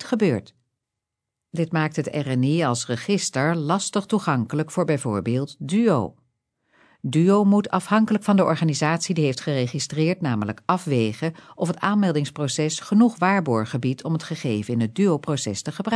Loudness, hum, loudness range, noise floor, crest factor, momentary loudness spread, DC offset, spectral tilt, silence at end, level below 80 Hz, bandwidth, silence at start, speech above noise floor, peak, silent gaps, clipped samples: -22 LUFS; none; 3 LU; -84 dBFS; 18 dB; 8 LU; under 0.1%; -6 dB/octave; 0 s; -66 dBFS; 11 kHz; 0 s; 62 dB; -4 dBFS; none; under 0.1%